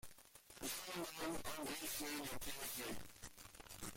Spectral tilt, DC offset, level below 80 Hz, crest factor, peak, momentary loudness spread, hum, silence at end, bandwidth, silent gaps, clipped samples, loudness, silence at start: -2 dB/octave; under 0.1%; -66 dBFS; 14 dB; -34 dBFS; 13 LU; none; 0 s; 16.5 kHz; none; under 0.1%; -46 LUFS; 0.05 s